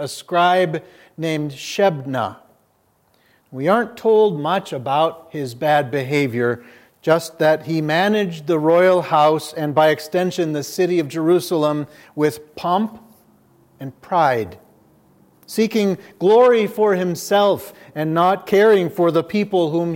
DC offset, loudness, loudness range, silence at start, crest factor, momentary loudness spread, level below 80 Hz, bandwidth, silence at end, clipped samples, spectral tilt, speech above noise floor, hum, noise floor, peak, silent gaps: under 0.1%; -18 LUFS; 6 LU; 0 s; 16 dB; 12 LU; -68 dBFS; 17 kHz; 0 s; under 0.1%; -5.5 dB/octave; 43 dB; none; -61 dBFS; -2 dBFS; none